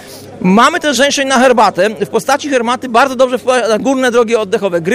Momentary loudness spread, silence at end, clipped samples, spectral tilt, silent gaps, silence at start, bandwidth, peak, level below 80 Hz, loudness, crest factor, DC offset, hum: 6 LU; 0 s; under 0.1%; -4 dB/octave; none; 0 s; 15.5 kHz; 0 dBFS; -50 dBFS; -11 LUFS; 12 dB; under 0.1%; none